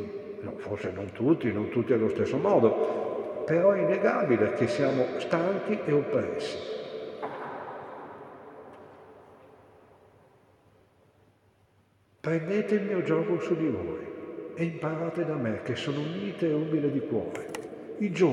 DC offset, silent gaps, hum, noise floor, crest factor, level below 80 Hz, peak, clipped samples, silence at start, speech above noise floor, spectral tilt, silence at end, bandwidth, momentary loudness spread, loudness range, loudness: under 0.1%; none; none; -65 dBFS; 20 dB; -72 dBFS; -10 dBFS; under 0.1%; 0 s; 38 dB; -7.5 dB/octave; 0 s; 11 kHz; 15 LU; 15 LU; -29 LUFS